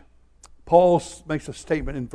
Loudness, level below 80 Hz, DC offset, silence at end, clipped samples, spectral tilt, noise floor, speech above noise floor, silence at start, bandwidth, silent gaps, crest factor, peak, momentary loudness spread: -22 LUFS; -42 dBFS; under 0.1%; 0.05 s; under 0.1%; -6.5 dB/octave; -52 dBFS; 31 dB; 0.65 s; 11 kHz; none; 20 dB; -4 dBFS; 13 LU